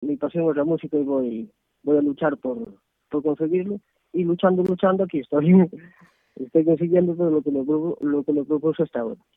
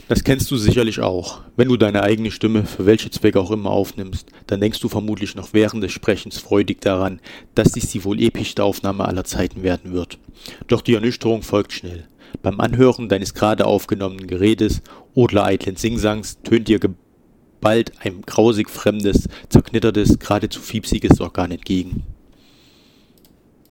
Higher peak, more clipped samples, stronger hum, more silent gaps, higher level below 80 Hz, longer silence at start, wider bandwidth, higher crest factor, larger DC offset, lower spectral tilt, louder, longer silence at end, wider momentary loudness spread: second, -4 dBFS vs 0 dBFS; neither; neither; neither; second, -64 dBFS vs -36 dBFS; about the same, 0 s vs 0.1 s; second, 3.9 kHz vs 17.5 kHz; about the same, 18 dB vs 18 dB; neither; first, -11 dB/octave vs -6 dB/octave; second, -22 LUFS vs -19 LUFS; second, 0.2 s vs 1.55 s; about the same, 11 LU vs 11 LU